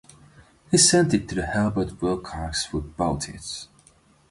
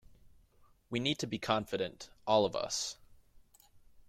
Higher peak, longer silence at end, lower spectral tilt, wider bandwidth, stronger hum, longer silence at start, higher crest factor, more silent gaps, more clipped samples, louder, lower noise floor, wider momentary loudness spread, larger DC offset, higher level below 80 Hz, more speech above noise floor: first, -4 dBFS vs -14 dBFS; first, 0.65 s vs 0.3 s; about the same, -3.5 dB/octave vs -3.5 dB/octave; second, 11.5 kHz vs 16 kHz; neither; second, 0.7 s vs 0.9 s; about the same, 20 dB vs 22 dB; neither; neither; first, -23 LUFS vs -34 LUFS; second, -58 dBFS vs -65 dBFS; first, 15 LU vs 11 LU; neither; first, -42 dBFS vs -66 dBFS; about the same, 34 dB vs 31 dB